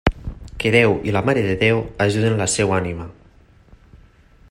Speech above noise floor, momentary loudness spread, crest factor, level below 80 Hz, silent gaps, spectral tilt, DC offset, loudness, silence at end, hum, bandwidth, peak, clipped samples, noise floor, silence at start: 32 dB; 17 LU; 20 dB; -36 dBFS; none; -5 dB/octave; under 0.1%; -18 LUFS; 0.55 s; none; 16 kHz; 0 dBFS; under 0.1%; -50 dBFS; 0.05 s